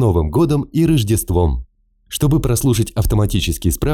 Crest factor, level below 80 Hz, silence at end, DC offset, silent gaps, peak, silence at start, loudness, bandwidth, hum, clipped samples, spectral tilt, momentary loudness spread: 10 dB; -26 dBFS; 0 s; under 0.1%; none; -6 dBFS; 0 s; -17 LUFS; 18.5 kHz; none; under 0.1%; -6 dB/octave; 4 LU